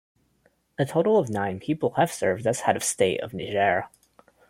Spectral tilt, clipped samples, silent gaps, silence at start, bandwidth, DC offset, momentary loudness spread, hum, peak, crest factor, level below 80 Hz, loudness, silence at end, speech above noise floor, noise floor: -4.5 dB/octave; under 0.1%; none; 0.8 s; 16.5 kHz; under 0.1%; 8 LU; none; -6 dBFS; 20 dB; -64 dBFS; -25 LUFS; 0.6 s; 42 dB; -66 dBFS